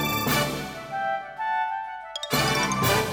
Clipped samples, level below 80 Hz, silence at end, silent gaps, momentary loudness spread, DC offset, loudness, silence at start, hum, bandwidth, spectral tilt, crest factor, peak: under 0.1%; -48 dBFS; 0 s; none; 11 LU; under 0.1%; -26 LUFS; 0 s; none; over 20 kHz; -3.5 dB/octave; 16 dB; -10 dBFS